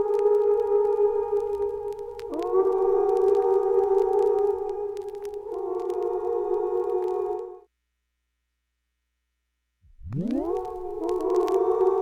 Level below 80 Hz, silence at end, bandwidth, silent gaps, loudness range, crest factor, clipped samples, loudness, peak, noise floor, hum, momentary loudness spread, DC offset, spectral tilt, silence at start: -54 dBFS; 0 s; 7.8 kHz; none; 11 LU; 16 dB; under 0.1%; -25 LUFS; -10 dBFS; -79 dBFS; 60 Hz at -70 dBFS; 12 LU; under 0.1%; -8 dB/octave; 0 s